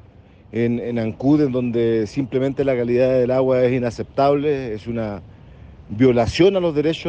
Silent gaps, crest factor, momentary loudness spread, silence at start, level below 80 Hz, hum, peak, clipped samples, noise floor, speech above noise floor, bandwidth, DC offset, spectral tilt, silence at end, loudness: none; 16 dB; 10 LU; 0.55 s; -46 dBFS; none; -4 dBFS; under 0.1%; -46 dBFS; 28 dB; 8.8 kHz; under 0.1%; -7.5 dB/octave; 0 s; -19 LUFS